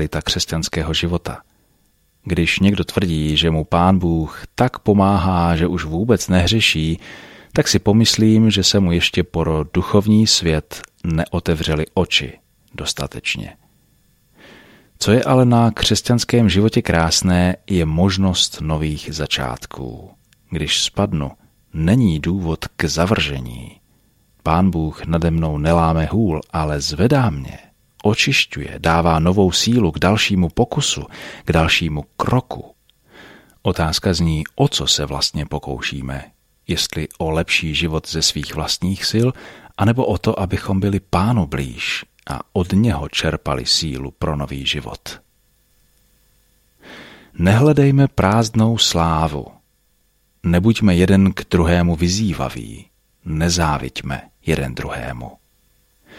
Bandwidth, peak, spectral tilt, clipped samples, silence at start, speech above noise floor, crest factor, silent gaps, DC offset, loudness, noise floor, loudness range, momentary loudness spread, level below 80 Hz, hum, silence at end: 15.5 kHz; -2 dBFS; -5 dB/octave; under 0.1%; 0 s; 44 dB; 16 dB; none; under 0.1%; -17 LUFS; -61 dBFS; 6 LU; 14 LU; -34 dBFS; none; 0.85 s